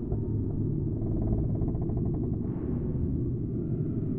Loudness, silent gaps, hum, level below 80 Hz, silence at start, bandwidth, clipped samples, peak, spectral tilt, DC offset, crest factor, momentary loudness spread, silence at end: -31 LUFS; none; none; -38 dBFS; 0 s; 2.2 kHz; under 0.1%; -16 dBFS; -14 dB/octave; under 0.1%; 14 dB; 3 LU; 0 s